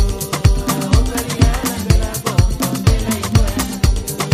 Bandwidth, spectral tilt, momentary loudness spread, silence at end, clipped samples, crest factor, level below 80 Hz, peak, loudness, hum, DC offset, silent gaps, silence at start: 15.5 kHz; -5 dB/octave; 3 LU; 0 s; under 0.1%; 14 dB; -20 dBFS; 0 dBFS; -17 LUFS; none; under 0.1%; none; 0 s